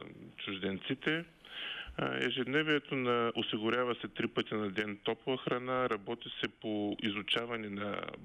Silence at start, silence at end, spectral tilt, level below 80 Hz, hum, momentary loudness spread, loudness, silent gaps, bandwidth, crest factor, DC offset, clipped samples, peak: 0 s; 0 s; -6 dB/octave; -66 dBFS; none; 8 LU; -35 LUFS; none; 11.5 kHz; 16 dB; under 0.1%; under 0.1%; -18 dBFS